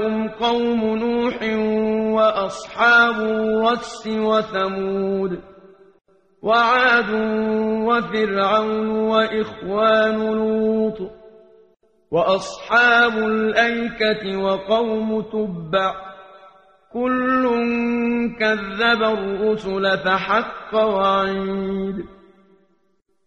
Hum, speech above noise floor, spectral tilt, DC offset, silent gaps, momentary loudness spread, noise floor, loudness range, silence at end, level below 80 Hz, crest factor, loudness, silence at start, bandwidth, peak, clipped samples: none; 48 dB; -5.5 dB/octave; under 0.1%; none; 9 LU; -67 dBFS; 4 LU; 1.15 s; -52 dBFS; 16 dB; -19 LUFS; 0 s; 9 kHz; -2 dBFS; under 0.1%